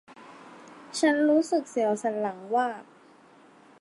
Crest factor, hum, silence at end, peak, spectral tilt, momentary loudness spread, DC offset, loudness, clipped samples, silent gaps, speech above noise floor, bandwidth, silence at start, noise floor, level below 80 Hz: 16 dB; none; 1 s; -12 dBFS; -4 dB/octave; 25 LU; under 0.1%; -26 LUFS; under 0.1%; none; 30 dB; 11.5 kHz; 0.1 s; -55 dBFS; -84 dBFS